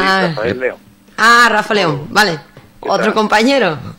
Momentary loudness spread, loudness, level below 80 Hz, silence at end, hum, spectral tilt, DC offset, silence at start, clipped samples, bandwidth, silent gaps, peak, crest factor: 13 LU; -12 LUFS; -46 dBFS; 0.05 s; none; -4 dB/octave; under 0.1%; 0 s; under 0.1%; 16.5 kHz; none; 0 dBFS; 14 dB